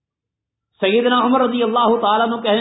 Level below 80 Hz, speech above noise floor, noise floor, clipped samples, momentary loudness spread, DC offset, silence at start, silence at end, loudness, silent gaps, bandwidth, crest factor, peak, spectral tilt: -68 dBFS; 67 dB; -83 dBFS; under 0.1%; 3 LU; under 0.1%; 0.8 s; 0 s; -16 LUFS; none; 4 kHz; 14 dB; -2 dBFS; -10 dB/octave